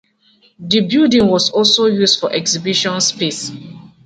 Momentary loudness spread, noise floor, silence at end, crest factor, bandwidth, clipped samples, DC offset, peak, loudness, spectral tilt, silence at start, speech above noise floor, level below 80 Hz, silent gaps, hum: 12 LU; -54 dBFS; 0.2 s; 16 dB; 9.4 kHz; under 0.1%; under 0.1%; 0 dBFS; -13 LUFS; -3.5 dB/octave; 0.6 s; 39 dB; -54 dBFS; none; none